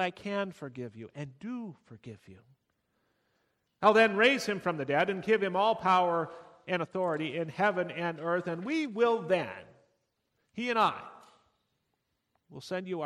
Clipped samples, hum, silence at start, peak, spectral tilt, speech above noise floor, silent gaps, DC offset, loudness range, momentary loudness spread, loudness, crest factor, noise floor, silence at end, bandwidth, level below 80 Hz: under 0.1%; none; 0 s; -10 dBFS; -5.5 dB/octave; 50 dB; none; under 0.1%; 9 LU; 20 LU; -29 LUFS; 22 dB; -80 dBFS; 0 s; 13.5 kHz; -76 dBFS